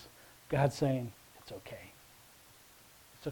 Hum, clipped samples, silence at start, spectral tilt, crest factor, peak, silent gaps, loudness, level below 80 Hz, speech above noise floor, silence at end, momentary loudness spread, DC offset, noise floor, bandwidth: none; under 0.1%; 0 s; -6.5 dB/octave; 24 dB; -16 dBFS; none; -35 LUFS; -62 dBFS; 26 dB; 0 s; 26 LU; under 0.1%; -60 dBFS; 19 kHz